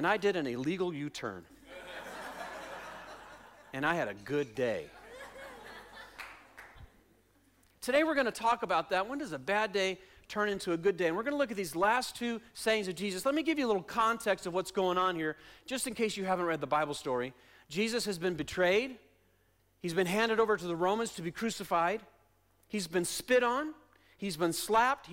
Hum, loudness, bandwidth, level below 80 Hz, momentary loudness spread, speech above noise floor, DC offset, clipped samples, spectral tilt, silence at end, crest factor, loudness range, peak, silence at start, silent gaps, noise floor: none; -32 LUFS; 16.5 kHz; -66 dBFS; 19 LU; 38 dB; under 0.1%; under 0.1%; -4 dB/octave; 0 s; 14 dB; 7 LU; -18 dBFS; 0 s; none; -70 dBFS